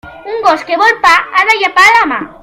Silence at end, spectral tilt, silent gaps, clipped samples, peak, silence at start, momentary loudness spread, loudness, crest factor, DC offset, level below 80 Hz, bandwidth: 0.1 s; -1.5 dB/octave; none; 1%; 0 dBFS; 0.05 s; 8 LU; -8 LUFS; 10 dB; under 0.1%; -46 dBFS; over 20 kHz